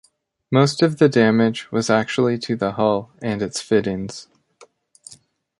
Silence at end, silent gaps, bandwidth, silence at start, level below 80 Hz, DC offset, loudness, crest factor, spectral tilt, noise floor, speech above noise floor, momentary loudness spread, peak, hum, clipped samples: 0.45 s; none; 11.5 kHz; 0.5 s; -56 dBFS; under 0.1%; -19 LUFS; 18 dB; -6 dB/octave; -53 dBFS; 34 dB; 11 LU; -2 dBFS; none; under 0.1%